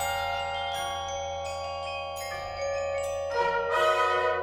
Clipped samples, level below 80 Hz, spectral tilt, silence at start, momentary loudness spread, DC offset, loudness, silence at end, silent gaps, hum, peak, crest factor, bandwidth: under 0.1%; -56 dBFS; -2.5 dB/octave; 0 s; 9 LU; under 0.1%; -29 LUFS; 0 s; none; none; -12 dBFS; 16 dB; 19 kHz